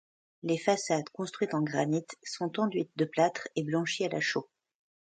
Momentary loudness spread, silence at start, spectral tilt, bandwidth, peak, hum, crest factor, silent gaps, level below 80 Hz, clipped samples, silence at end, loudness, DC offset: 8 LU; 0.45 s; -5 dB/octave; 9.4 kHz; -12 dBFS; none; 18 dB; none; -76 dBFS; under 0.1%; 0.7 s; -31 LUFS; under 0.1%